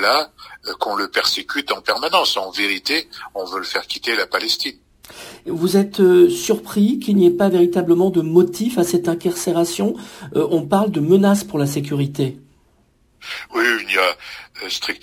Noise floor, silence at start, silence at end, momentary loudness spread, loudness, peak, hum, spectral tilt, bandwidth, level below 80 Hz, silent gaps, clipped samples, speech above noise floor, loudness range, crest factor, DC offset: -58 dBFS; 0 s; 0.05 s; 15 LU; -18 LUFS; -2 dBFS; none; -4.5 dB/octave; 16 kHz; -58 dBFS; none; under 0.1%; 40 dB; 6 LU; 16 dB; under 0.1%